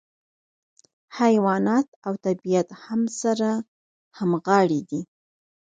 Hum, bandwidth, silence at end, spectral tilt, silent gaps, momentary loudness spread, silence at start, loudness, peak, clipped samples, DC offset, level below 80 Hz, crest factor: none; 9.4 kHz; 0.7 s; -6 dB/octave; 1.88-2.02 s, 3.68-4.11 s; 13 LU; 1.1 s; -23 LUFS; -4 dBFS; under 0.1%; under 0.1%; -72 dBFS; 20 dB